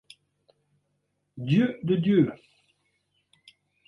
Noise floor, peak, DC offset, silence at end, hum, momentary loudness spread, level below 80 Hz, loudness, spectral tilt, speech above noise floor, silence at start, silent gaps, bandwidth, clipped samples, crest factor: -76 dBFS; -10 dBFS; under 0.1%; 1.55 s; none; 6 LU; -68 dBFS; -24 LUFS; -9 dB/octave; 53 dB; 1.35 s; none; 10.5 kHz; under 0.1%; 18 dB